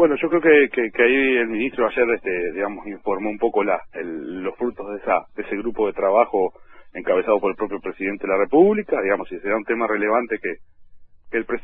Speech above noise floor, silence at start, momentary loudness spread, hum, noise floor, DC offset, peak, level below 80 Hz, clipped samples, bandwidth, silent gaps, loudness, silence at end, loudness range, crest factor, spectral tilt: 21 dB; 0 s; 13 LU; none; -41 dBFS; under 0.1%; -2 dBFS; -52 dBFS; under 0.1%; 3.8 kHz; none; -21 LUFS; 0 s; 5 LU; 18 dB; -8.5 dB/octave